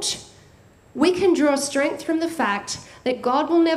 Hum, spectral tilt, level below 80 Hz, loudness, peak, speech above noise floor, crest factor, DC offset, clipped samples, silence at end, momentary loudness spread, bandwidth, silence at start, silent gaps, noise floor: none; -3 dB/octave; -60 dBFS; -22 LUFS; -6 dBFS; 31 dB; 16 dB; under 0.1%; under 0.1%; 0 s; 10 LU; 14.5 kHz; 0 s; none; -51 dBFS